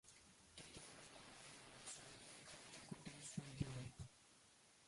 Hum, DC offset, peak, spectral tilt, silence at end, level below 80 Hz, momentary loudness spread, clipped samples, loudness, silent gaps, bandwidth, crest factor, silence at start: none; under 0.1%; -32 dBFS; -4 dB/octave; 0 s; -72 dBFS; 15 LU; under 0.1%; -56 LUFS; none; 11.5 kHz; 26 dB; 0.05 s